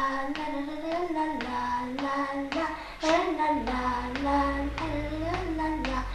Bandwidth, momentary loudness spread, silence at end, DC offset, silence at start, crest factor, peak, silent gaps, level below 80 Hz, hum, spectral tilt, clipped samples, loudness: 13 kHz; 6 LU; 0 s; under 0.1%; 0 s; 18 dB; -12 dBFS; none; -42 dBFS; none; -5.5 dB/octave; under 0.1%; -30 LUFS